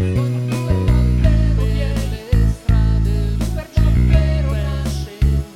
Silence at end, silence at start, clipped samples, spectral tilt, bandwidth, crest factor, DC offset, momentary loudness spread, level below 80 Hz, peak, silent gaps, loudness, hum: 0 s; 0 s; under 0.1%; -7.5 dB/octave; 13.5 kHz; 14 dB; under 0.1%; 6 LU; -18 dBFS; -2 dBFS; none; -18 LUFS; none